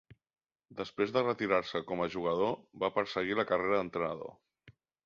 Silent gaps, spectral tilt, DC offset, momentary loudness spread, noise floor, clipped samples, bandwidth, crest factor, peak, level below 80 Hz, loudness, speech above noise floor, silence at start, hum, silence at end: none; -6 dB/octave; under 0.1%; 12 LU; -63 dBFS; under 0.1%; 7.2 kHz; 20 dB; -14 dBFS; -68 dBFS; -33 LUFS; 30 dB; 0.1 s; none; 0.35 s